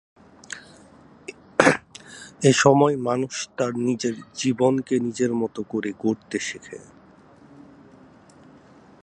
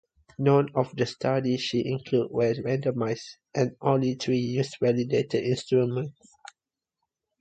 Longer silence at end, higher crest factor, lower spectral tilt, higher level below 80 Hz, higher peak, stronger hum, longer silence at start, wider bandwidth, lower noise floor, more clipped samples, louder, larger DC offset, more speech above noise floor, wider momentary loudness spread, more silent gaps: first, 2.2 s vs 1.3 s; about the same, 24 dB vs 20 dB; second, -5 dB/octave vs -6.5 dB/octave; about the same, -62 dBFS vs -64 dBFS; first, 0 dBFS vs -8 dBFS; neither; about the same, 0.5 s vs 0.4 s; first, 11.5 kHz vs 9 kHz; second, -51 dBFS vs -88 dBFS; neither; first, -22 LUFS vs -26 LUFS; neither; second, 28 dB vs 62 dB; first, 24 LU vs 6 LU; neither